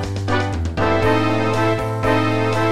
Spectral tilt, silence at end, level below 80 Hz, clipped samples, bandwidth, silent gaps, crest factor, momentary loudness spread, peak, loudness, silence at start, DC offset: -6.5 dB/octave; 0 s; -36 dBFS; under 0.1%; 14 kHz; none; 14 dB; 4 LU; -4 dBFS; -19 LUFS; 0 s; under 0.1%